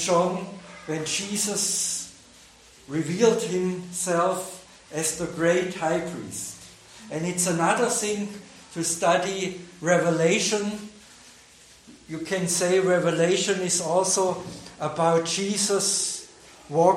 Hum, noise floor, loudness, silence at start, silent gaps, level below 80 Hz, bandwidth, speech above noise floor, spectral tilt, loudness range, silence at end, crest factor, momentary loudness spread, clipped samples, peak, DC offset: none; -52 dBFS; -24 LUFS; 0 s; none; -64 dBFS; 16.5 kHz; 28 dB; -3.5 dB/octave; 4 LU; 0 s; 20 dB; 15 LU; under 0.1%; -6 dBFS; under 0.1%